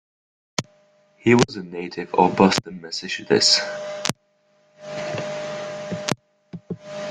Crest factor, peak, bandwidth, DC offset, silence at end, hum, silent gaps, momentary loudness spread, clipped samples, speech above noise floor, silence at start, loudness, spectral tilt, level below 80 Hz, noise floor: 24 dB; 0 dBFS; 13.5 kHz; under 0.1%; 0 s; none; none; 19 LU; under 0.1%; 43 dB; 0.6 s; -22 LUFS; -4 dB/octave; -58 dBFS; -63 dBFS